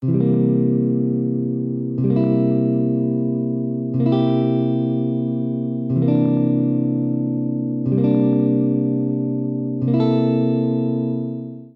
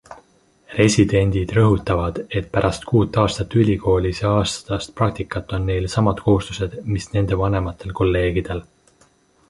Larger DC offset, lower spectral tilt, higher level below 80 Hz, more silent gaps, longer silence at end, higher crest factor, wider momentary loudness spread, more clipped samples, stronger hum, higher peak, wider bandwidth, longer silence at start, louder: neither; first, -12 dB/octave vs -6.5 dB/octave; second, -62 dBFS vs -34 dBFS; neither; second, 0.1 s vs 0.85 s; second, 12 dB vs 18 dB; second, 6 LU vs 9 LU; neither; neither; second, -6 dBFS vs -2 dBFS; second, 4.2 kHz vs 11.5 kHz; about the same, 0 s vs 0.1 s; about the same, -19 LUFS vs -20 LUFS